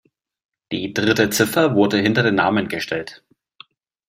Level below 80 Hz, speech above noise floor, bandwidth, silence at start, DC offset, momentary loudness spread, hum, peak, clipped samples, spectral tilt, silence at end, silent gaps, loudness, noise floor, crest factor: -58 dBFS; 31 dB; 16 kHz; 0.7 s; under 0.1%; 11 LU; none; -2 dBFS; under 0.1%; -4.5 dB/octave; 0.9 s; none; -18 LUFS; -49 dBFS; 18 dB